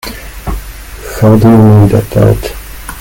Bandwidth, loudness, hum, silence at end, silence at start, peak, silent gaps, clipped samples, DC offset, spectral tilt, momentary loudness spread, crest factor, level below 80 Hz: 17 kHz; -7 LUFS; none; 0 s; 0.05 s; 0 dBFS; none; 3%; under 0.1%; -8 dB/octave; 21 LU; 8 dB; -24 dBFS